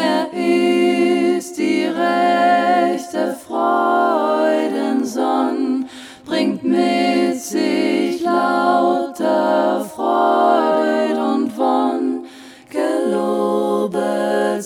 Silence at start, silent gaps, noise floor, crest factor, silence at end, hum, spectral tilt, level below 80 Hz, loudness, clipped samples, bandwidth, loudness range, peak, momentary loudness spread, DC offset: 0 s; none; -39 dBFS; 14 dB; 0 s; none; -5 dB/octave; -70 dBFS; -17 LUFS; under 0.1%; 16 kHz; 2 LU; -2 dBFS; 6 LU; under 0.1%